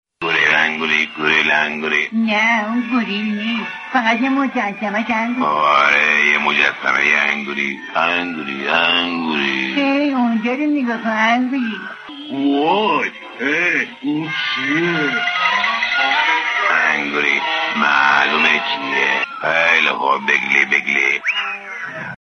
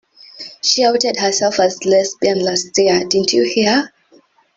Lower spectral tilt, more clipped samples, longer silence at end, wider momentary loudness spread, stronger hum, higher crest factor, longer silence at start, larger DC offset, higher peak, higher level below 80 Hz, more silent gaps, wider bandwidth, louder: about the same, -3.5 dB/octave vs -2.5 dB/octave; neither; second, 0.05 s vs 0.7 s; first, 8 LU vs 5 LU; neither; about the same, 16 dB vs 16 dB; second, 0.2 s vs 0.35 s; neither; about the same, -2 dBFS vs 0 dBFS; about the same, -62 dBFS vs -58 dBFS; neither; second, 6.6 kHz vs 8 kHz; about the same, -16 LUFS vs -15 LUFS